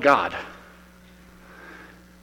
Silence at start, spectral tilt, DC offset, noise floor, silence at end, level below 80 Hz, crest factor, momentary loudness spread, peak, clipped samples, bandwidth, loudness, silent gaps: 0 s; -4.5 dB/octave; under 0.1%; -50 dBFS; 0.4 s; -56 dBFS; 24 dB; 28 LU; -4 dBFS; under 0.1%; 16.5 kHz; -23 LUFS; none